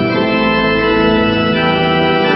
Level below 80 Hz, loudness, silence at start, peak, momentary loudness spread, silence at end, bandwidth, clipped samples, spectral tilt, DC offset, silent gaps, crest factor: -34 dBFS; -12 LUFS; 0 s; 0 dBFS; 1 LU; 0 s; 6 kHz; under 0.1%; -8 dB/octave; under 0.1%; none; 12 dB